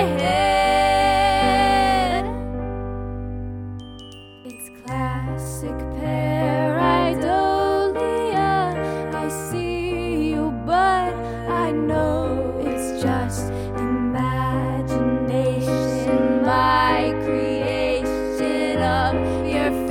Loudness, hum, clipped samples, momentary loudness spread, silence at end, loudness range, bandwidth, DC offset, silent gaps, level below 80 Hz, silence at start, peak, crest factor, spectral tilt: -21 LUFS; none; under 0.1%; 12 LU; 0 s; 7 LU; 18 kHz; under 0.1%; none; -36 dBFS; 0 s; -6 dBFS; 16 dB; -6 dB/octave